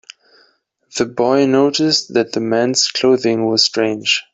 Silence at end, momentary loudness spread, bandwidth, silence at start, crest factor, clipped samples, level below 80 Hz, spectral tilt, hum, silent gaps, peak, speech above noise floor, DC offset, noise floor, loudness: 0.1 s; 5 LU; 8.4 kHz; 0.95 s; 16 dB; under 0.1%; -60 dBFS; -3.5 dB/octave; none; none; 0 dBFS; 43 dB; under 0.1%; -58 dBFS; -15 LUFS